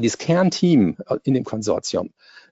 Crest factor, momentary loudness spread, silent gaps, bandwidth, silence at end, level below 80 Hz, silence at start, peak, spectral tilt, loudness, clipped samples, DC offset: 14 dB; 9 LU; none; 8 kHz; 0.1 s; -60 dBFS; 0 s; -6 dBFS; -6 dB/octave; -20 LUFS; under 0.1%; under 0.1%